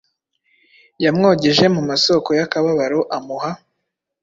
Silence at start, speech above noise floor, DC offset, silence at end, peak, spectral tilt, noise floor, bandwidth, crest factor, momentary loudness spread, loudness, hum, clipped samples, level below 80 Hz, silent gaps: 1 s; 60 dB; under 0.1%; 0.65 s; -2 dBFS; -5 dB/octave; -76 dBFS; 7.8 kHz; 16 dB; 12 LU; -17 LUFS; none; under 0.1%; -58 dBFS; none